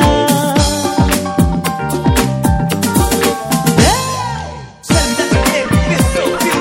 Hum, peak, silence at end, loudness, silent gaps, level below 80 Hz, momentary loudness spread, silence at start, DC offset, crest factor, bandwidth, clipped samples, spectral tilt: none; 0 dBFS; 0 s; -13 LUFS; none; -24 dBFS; 6 LU; 0 s; under 0.1%; 14 dB; 16.5 kHz; under 0.1%; -4.5 dB/octave